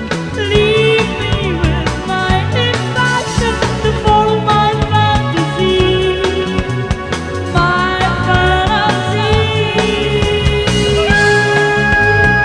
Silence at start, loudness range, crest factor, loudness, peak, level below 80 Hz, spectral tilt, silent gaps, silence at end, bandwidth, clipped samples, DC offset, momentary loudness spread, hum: 0 s; 2 LU; 12 dB; -13 LUFS; 0 dBFS; -24 dBFS; -5 dB/octave; none; 0 s; 10.5 kHz; under 0.1%; under 0.1%; 7 LU; none